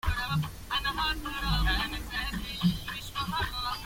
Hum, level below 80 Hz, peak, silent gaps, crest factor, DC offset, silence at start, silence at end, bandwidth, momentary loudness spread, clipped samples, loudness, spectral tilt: none; -38 dBFS; -14 dBFS; none; 16 dB; under 0.1%; 0.05 s; 0 s; 16.5 kHz; 6 LU; under 0.1%; -31 LUFS; -4 dB/octave